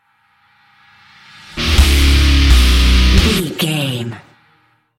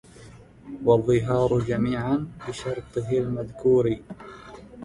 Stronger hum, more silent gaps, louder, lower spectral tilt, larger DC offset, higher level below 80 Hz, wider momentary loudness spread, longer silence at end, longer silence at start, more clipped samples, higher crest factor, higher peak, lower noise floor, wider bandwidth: neither; neither; first, -13 LUFS vs -24 LUFS; second, -4.5 dB/octave vs -7.5 dB/octave; neither; first, -16 dBFS vs -48 dBFS; second, 11 LU vs 21 LU; first, 0.8 s vs 0 s; first, 1.55 s vs 0.2 s; neither; second, 14 dB vs 20 dB; first, 0 dBFS vs -6 dBFS; first, -56 dBFS vs -47 dBFS; first, 16 kHz vs 11 kHz